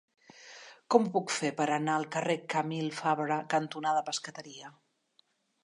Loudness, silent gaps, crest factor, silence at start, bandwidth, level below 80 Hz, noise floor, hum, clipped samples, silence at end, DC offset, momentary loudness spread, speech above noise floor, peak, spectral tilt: -31 LUFS; none; 24 dB; 0.35 s; 11.5 kHz; -86 dBFS; -71 dBFS; none; under 0.1%; 0.95 s; under 0.1%; 21 LU; 40 dB; -8 dBFS; -4.5 dB/octave